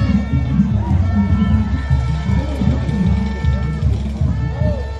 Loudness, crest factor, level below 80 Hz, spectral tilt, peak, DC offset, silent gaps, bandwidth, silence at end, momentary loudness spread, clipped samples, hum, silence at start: -18 LUFS; 14 dB; -22 dBFS; -8.5 dB/octave; -2 dBFS; under 0.1%; none; 7.8 kHz; 0 s; 3 LU; under 0.1%; none; 0 s